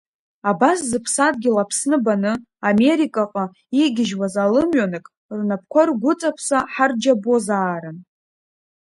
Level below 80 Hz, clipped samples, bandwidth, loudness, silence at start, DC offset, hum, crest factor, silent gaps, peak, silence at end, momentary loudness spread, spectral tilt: -60 dBFS; under 0.1%; 11.5 kHz; -19 LUFS; 0.45 s; under 0.1%; none; 18 dB; 5.17-5.29 s; -2 dBFS; 0.95 s; 8 LU; -4.5 dB/octave